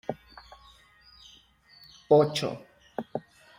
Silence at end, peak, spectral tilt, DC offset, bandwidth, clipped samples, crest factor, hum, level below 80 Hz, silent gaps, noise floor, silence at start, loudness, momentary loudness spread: 0.4 s; -8 dBFS; -6 dB/octave; under 0.1%; 16 kHz; under 0.1%; 22 dB; none; -66 dBFS; none; -58 dBFS; 0.1 s; -27 LUFS; 28 LU